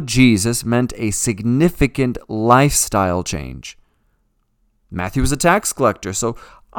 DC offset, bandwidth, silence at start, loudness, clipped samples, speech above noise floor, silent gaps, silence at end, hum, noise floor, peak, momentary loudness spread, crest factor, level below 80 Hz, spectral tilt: under 0.1%; 19 kHz; 0 s; -17 LUFS; under 0.1%; 47 dB; none; 0 s; none; -64 dBFS; 0 dBFS; 14 LU; 18 dB; -34 dBFS; -4.5 dB/octave